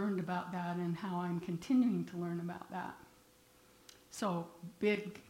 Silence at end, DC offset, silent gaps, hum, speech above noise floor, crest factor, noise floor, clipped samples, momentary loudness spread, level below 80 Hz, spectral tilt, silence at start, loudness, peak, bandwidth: 0 s; under 0.1%; none; none; 28 dB; 16 dB; -65 dBFS; under 0.1%; 13 LU; -74 dBFS; -6.5 dB/octave; 0 s; -38 LUFS; -22 dBFS; 16 kHz